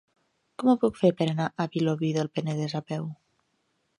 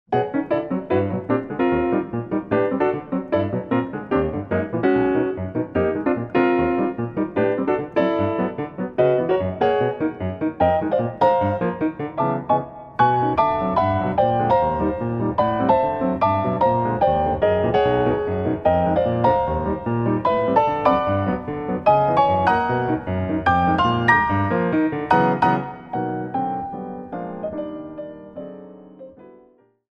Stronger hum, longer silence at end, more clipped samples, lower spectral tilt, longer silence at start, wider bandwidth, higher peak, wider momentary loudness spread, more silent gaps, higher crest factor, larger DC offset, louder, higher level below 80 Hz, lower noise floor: neither; first, 0.85 s vs 0.65 s; neither; second, -7 dB/octave vs -9 dB/octave; first, 0.6 s vs 0.1 s; first, 10.5 kHz vs 6.6 kHz; second, -8 dBFS vs -2 dBFS; first, 11 LU vs 8 LU; neither; about the same, 20 dB vs 18 dB; neither; second, -27 LUFS vs -21 LUFS; second, -68 dBFS vs -44 dBFS; first, -74 dBFS vs -55 dBFS